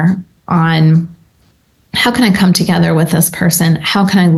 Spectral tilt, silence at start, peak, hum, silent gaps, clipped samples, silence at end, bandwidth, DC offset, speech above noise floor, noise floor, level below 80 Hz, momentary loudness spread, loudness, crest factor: -5 dB/octave; 0 s; 0 dBFS; none; none; under 0.1%; 0 s; 13 kHz; under 0.1%; 42 dB; -53 dBFS; -44 dBFS; 6 LU; -11 LUFS; 12 dB